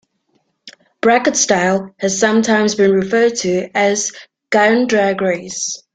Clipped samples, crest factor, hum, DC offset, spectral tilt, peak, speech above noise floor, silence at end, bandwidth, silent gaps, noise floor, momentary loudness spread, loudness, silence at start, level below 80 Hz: under 0.1%; 14 dB; none; under 0.1%; -3.5 dB/octave; -2 dBFS; 49 dB; 0.2 s; 9.4 kHz; none; -64 dBFS; 7 LU; -15 LUFS; 0.65 s; -58 dBFS